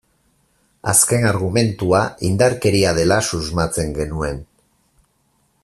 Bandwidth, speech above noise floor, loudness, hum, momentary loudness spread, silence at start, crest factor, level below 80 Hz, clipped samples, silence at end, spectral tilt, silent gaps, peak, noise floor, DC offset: 14.5 kHz; 46 dB; -17 LUFS; none; 10 LU; 0.85 s; 18 dB; -40 dBFS; under 0.1%; 1.2 s; -4 dB/octave; none; 0 dBFS; -63 dBFS; under 0.1%